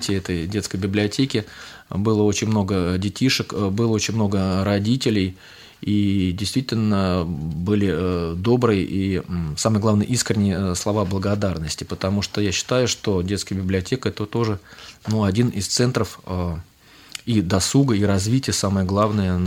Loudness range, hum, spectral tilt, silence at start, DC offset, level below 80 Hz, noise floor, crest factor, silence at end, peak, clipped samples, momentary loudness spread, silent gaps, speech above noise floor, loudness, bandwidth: 2 LU; none; -5.5 dB/octave; 0 s; under 0.1%; -46 dBFS; -40 dBFS; 18 dB; 0 s; -4 dBFS; under 0.1%; 8 LU; none; 19 dB; -21 LUFS; 16 kHz